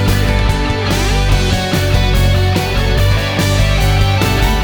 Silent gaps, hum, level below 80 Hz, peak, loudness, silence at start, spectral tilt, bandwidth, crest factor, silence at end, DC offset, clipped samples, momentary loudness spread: none; none; -16 dBFS; 0 dBFS; -14 LUFS; 0 s; -5 dB/octave; over 20 kHz; 12 dB; 0 s; under 0.1%; under 0.1%; 2 LU